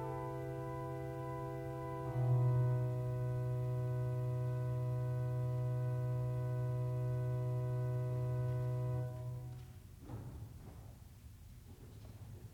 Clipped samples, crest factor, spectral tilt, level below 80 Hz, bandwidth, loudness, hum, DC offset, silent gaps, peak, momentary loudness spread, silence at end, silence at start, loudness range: under 0.1%; 14 dB; -9 dB/octave; -60 dBFS; 5.6 kHz; -39 LUFS; none; under 0.1%; none; -26 dBFS; 19 LU; 0 s; 0 s; 8 LU